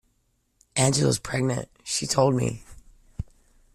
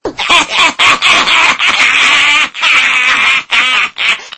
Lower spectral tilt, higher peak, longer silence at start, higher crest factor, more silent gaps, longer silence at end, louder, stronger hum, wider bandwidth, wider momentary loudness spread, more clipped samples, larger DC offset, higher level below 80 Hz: first, -4.5 dB/octave vs 0.5 dB/octave; second, -6 dBFS vs 0 dBFS; first, 0.75 s vs 0.05 s; first, 20 dB vs 10 dB; neither; first, 0.5 s vs 0.1 s; second, -24 LUFS vs -7 LUFS; neither; first, 14.5 kHz vs 11 kHz; first, 18 LU vs 4 LU; second, under 0.1% vs 1%; neither; about the same, -48 dBFS vs -46 dBFS